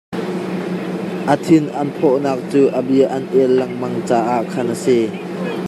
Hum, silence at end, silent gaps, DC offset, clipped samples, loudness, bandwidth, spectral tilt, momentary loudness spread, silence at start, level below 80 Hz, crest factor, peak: none; 0 s; none; under 0.1%; under 0.1%; -17 LUFS; 13.5 kHz; -7 dB/octave; 8 LU; 0.1 s; -64 dBFS; 16 dB; -2 dBFS